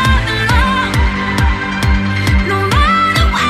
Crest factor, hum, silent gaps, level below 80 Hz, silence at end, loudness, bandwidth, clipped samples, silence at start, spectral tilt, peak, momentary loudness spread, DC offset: 12 dB; none; none; -18 dBFS; 0 s; -13 LUFS; 15.5 kHz; under 0.1%; 0 s; -5 dB/octave; 0 dBFS; 4 LU; under 0.1%